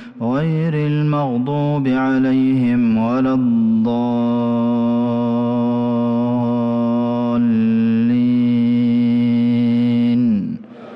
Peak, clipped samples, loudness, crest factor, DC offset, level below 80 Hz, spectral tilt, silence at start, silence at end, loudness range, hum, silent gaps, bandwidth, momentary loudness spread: -10 dBFS; under 0.1%; -17 LUFS; 6 dB; under 0.1%; -56 dBFS; -10 dB/octave; 0 s; 0 s; 2 LU; none; none; 5.6 kHz; 3 LU